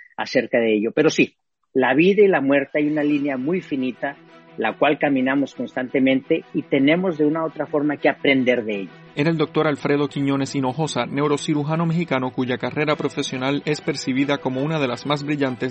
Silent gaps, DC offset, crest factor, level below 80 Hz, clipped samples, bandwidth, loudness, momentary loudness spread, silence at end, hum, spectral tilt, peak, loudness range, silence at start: none; under 0.1%; 18 dB; -64 dBFS; under 0.1%; 8.4 kHz; -21 LUFS; 7 LU; 0 s; none; -6 dB/octave; -4 dBFS; 4 LU; 0.2 s